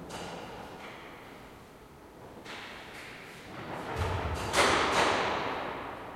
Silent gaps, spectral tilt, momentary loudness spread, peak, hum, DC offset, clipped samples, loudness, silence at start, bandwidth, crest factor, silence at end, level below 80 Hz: none; -3.5 dB/octave; 24 LU; -12 dBFS; none; under 0.1%; under 0.1%; -31 LUFS; 0 s; 16.5 kHz; 22 dB; 0 s; -52 dBFS